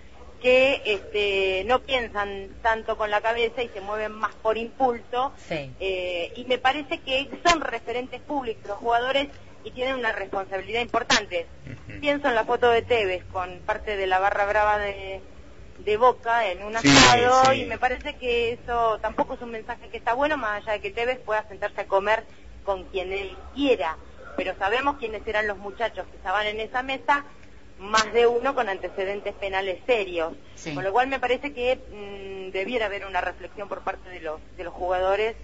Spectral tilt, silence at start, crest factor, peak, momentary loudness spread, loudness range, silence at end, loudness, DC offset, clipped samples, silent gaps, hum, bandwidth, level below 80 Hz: -3 dB/octave; 0.05 s; 22 dB; -4 dBFS; 12 LU; 7 LU; 0 s; -24 LUFS; 0.5%; under 0.1%; none; none; 8 kHz; -48 dBFS